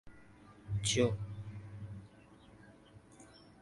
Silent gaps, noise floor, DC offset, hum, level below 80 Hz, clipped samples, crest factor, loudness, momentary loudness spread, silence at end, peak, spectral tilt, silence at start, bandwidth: none; -60 dBFS; under 0.1%; none; -60 dBFS; under 0.1%; 22 dB; -37 LUFS; 28 LU; 0.15 s; -18 dBFS; -4.5 dB/octave; 0.05 s; 11.5 kHz